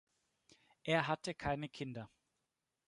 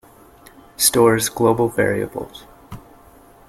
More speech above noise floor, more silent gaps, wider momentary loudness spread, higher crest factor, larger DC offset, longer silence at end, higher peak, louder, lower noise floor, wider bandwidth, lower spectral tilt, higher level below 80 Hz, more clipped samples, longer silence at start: first, 49 dB vs 30 dB; neither; second, 14 LU vs 19 LU; about the same, 24 dB vs 20 dB; neither; about the same, 0.8 s vs 0.7 s; second, -18 dBFS vs 0 dBFS; second, -39 LUFS vs -17 LUFS; first, -88 dBFS vs -47 dBFS; second, 11 kHz vs 16 kHz; first, -5.5 dB/octave vs -3.5 dB/octave; second, -66 dBFS vs -48 dBFS; neither; about the same, 0.85 s vs 0.8 s